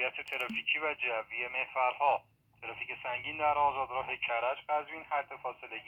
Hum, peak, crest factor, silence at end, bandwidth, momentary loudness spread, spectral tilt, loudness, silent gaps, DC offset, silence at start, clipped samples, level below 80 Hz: none; -16 dBFS; 18 dB; 0 s; 16.5 kHz; 11 LU; -4 dB/octave; -33 LUFS; none; under 0.1%; 0 s; under 0.1%; -70 dBFS